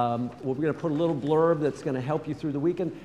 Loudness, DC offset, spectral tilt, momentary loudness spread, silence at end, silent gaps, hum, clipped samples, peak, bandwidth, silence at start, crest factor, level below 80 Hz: -27 LUFS; under 0.1%; -8 dB/octave; 8 LU; 0 s; none; none; under 0.1%; -10 dBFS; 10.5 kHz; 0 s; 16 dB; -62 dBFS